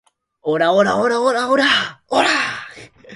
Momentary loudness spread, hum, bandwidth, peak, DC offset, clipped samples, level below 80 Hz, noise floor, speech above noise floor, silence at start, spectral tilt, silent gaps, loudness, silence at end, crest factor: 11 LU; none; 11.5 kHz; 0 dBFS; under 0.1%; under 0.1%; -60 dBFS; -39 dBFS; 23 dB; 0.45 s; -3.5 dB/octave; none; -16 LUFS; 0 s; 18 dB